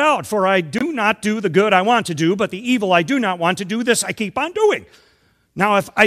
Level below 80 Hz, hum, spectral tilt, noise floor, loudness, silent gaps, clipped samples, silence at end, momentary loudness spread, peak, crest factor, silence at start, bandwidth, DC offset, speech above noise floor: -60 dBFS; none; -4 dB/octave; -58 dBFS; -18 LUFS; none; under 0.1%; 0 s; 7 LU; 0 dBFS; 18 dB; 0 s; 15 kHz; under 0.1%; 41 dB